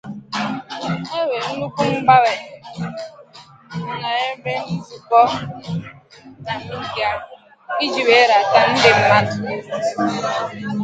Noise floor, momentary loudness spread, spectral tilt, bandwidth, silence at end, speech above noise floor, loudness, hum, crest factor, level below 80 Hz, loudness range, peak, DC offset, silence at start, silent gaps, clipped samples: -44 dBFS; 16 LU; -4.5 dB/octave; 9.2 kHz; 0 s; 26 dB; -18 LUFS; none; 18 dB; -56 dBFS; 6 LU; 0 dBFS; under 0.1%; 0.05 s; none; under 0.1%